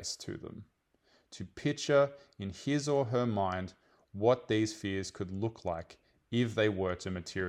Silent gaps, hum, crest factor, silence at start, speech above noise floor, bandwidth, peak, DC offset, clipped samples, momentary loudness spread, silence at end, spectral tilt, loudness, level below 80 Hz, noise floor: none; none; 20 dB; 0 s; 38 dB; 13.5 kHz; -14 dBFS; under 0.1%; under 0.1%; 18 LU; 0 s; -5.5 dB/octave; -33 LUFS; -68 dBFS; -70 dBFS